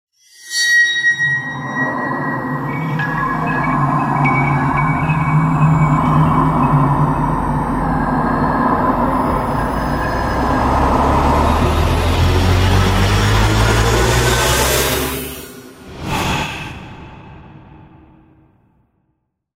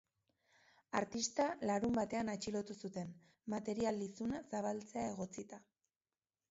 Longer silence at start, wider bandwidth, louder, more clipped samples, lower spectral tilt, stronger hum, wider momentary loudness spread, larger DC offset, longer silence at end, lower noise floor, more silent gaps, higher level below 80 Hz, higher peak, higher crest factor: second, 0.4 s vs 0.95 s; first, 16 kHz vs 7.6 kHz; first, -15 LUFS vs -41 LUFS; neither; about the same, -5 dB/octave vs -5 dB/octave; neither; second, 8 LU vs 11 LU; neither; first, 1.85 s vs 0.9 s; second, -68 dBFS vs under -90 dBFS; neither; first, -26 dBFS vs -72 dBFS; first, 0 dBFS vs -22 dBFS; second, 14 dB vs 20 dB